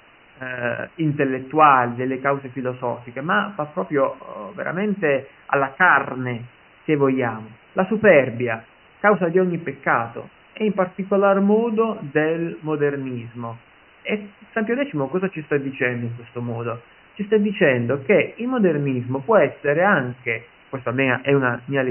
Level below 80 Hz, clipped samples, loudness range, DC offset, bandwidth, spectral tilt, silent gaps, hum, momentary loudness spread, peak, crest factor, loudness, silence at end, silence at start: -64 dBFS; under 0.1%; 6 LU; under 0.1%; 3.2 kHz; -11.5 dB/octave; none; none; 14 LU; -2 dBFS; 18 dB; -21 LUFS; 0 s; 0.4 s